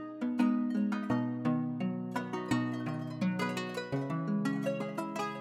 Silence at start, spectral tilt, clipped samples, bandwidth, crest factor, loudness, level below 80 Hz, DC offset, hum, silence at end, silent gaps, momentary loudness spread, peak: 0 s; -7 dB/octave; under 0.1%; 14.5 kHz; 18 dB; -34 LUFS; -72 dBFS; under 0.1%; none; 0 s; none; 6 LU; -16 dBFS